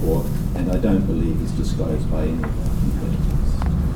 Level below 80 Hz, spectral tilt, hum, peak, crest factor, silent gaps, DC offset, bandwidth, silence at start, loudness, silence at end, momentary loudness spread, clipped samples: -22 dBFS; -8 dB/octave; none; -6 dBFS; 14 dB; none; under 0.1%; 17.5 kHz; 0 s; -22 LUFS; 0 s; 4 LU; under 0.1%